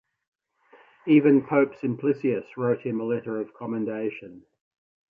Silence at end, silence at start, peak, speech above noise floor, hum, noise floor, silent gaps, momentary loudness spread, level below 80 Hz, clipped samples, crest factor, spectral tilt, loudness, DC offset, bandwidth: 0.75 s; 1.05 s; -6 dBFS; 34 dB; none; -58 dBFS; none; 13 LU; -72 dBFS; under 0.1%; 20 dB; -10 dB/octave; -25 LUFS; under 0.1%; 4.4 kHz